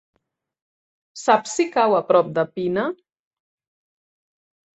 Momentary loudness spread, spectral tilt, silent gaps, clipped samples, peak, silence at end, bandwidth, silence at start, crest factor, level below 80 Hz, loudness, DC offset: 8 LU; -4.5 dB/octave; none; under 0.1%; -2 dBFS; 1.85 s; 8.4 kHz; 1.15 s; 22 dB; -68 dBFS; -20 LUFS; under 0.1%